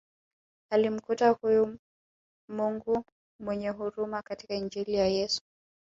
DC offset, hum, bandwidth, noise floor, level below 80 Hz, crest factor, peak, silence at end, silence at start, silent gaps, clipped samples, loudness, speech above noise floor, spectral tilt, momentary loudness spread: under 0.1%; none; 7.8 kHz; under -90 dBFS; -62 dBFS; 20 dB; -10 dBFS; 0.55 s; 0.7 s; 1.79-2.48 s, 3.12-3.39 s; under 0.1%; -30 LUFS; over 61 dB; -5 dB/octave; 10 LU